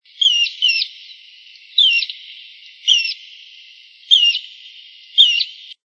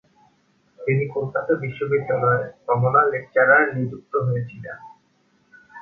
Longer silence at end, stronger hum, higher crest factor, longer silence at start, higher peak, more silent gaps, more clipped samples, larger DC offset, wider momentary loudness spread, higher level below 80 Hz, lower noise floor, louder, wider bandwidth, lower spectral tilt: about the same, 0.1 s vs 0 s; neither; about the same, 20 dB vs 20 dB; second, 0.2 s vs 0.8 s; about the same, 0 dBFS vs -2 dBFS; neither; neither; neither; about the same, 16 LU vs 14 LU; second, -86 dBFS vs -60 dBFS; second, -44 dBFS vs -63 dBFS; first, -14 LUFS vs -21 LUFS; first, 11 kHz vs 3.8 kHz; second, 8.5 dB/octave vs -10 dB/octave